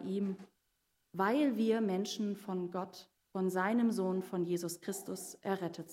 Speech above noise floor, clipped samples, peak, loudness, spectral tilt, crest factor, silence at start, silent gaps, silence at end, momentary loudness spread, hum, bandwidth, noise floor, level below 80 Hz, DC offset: 45 dB; under 0.1%; -18 dBFS; -35 LUFS; -5.5 dB/octave; 18 dB; 0 s; none; 0 s; 12 LU; none; 16 kHz; -80 dBFS; -86 dBFS; under 0.1%